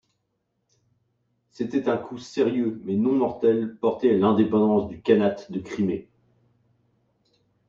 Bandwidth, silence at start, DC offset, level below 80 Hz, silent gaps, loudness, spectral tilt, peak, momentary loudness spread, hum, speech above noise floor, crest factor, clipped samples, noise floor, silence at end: 7.6 kHz; 1.6 s; under 0.1%; -62 dBFS; none; -24 LUFS; -8 dB/octave; -6 dBFS; 10 LU; none; 53 dB; 18 dB; under 0.1%; -76 dBFS; 1.65 s